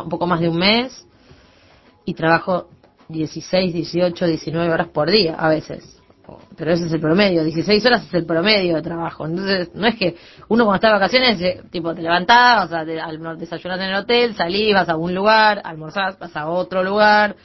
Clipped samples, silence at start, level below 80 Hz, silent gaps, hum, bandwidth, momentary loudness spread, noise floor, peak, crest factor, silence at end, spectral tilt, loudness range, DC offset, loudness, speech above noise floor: under 0.1%; 0 s; -50 dBFS; none; none; 6.2 kHz; 13 LU; -51 dBFS; 0 dBFS; 18 dB; 0.1 s; -6 dB/octave; 5 LU; under 0.1%; -17 LUFS; 33 dB